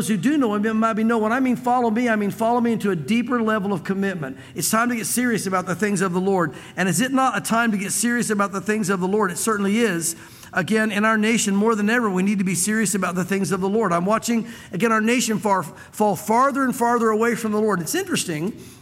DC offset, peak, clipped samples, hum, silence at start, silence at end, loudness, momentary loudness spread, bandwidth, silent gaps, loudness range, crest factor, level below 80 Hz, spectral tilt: under 0.1%; -6 dBFS; under 0.1%; none; 0 s; 0.05 s; -21 LUFS; 5 LU; 16.5 kHz; none; 2 LU; 14 dB; -62 dBFS; -4.5 dB/octave